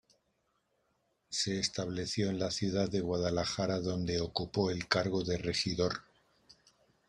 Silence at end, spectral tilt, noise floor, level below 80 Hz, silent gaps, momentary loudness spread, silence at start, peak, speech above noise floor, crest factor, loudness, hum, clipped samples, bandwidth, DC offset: 1.1 s; -4.5 dB/octave; -78 dBFS; -60 dBFS; none; 4 LU; 1.3 s; -10 dBFS; 45 dB; 24 dB; -34 LUFS; none; under 0.1%; 11.5 kHz; under 0.1%